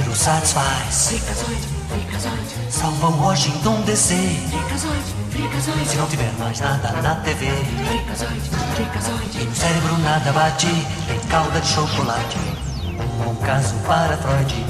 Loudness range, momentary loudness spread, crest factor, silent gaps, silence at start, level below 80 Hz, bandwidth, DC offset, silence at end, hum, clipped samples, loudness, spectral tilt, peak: 2 LU; 8 LU; 18 dB; none; 0 s; -34 dBFS; 14 kHz; under 0.1%; 0 s; none; under 0.1%; -20 LUFS; -4 dB/octave; -2 dBFS